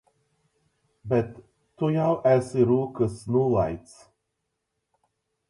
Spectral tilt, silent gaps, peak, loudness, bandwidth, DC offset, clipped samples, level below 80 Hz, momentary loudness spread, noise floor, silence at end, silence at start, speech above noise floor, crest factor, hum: -8.5 dB/octave; none; -8 dBFS; -24 LUFS; 11.5 kHz; under 0.1%; under 0.1%; -54 dBFS; 10 LU; -80 dBFS; 1.7 s; 1.05 s; 56 dB; 18 dB; none